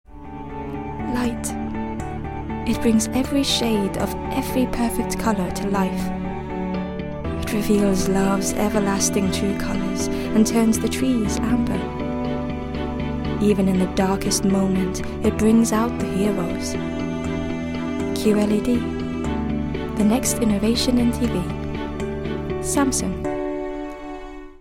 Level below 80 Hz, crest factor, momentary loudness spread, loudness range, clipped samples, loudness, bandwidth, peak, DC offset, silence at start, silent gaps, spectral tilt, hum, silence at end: -36 dBFS; 16 dB; 9 LU; 3 LU; under 0.1%; -22 LUFS; 16.5 kHz; -6 dBFS; under 0.1%; 0.1 s; none; -5 dB/octave; none; 0.05 s